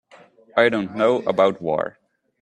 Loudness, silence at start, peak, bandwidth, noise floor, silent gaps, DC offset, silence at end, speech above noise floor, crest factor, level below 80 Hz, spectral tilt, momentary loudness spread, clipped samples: -21 LUFS; 0.55 s; -2 dBFS; 9.4 kHz; -51 dBFS; none; under 0.1%; 0.5 s; 31 dB; 20 dB; -64 dBFS; -6 dB/octave; 7 LU; under 0.1%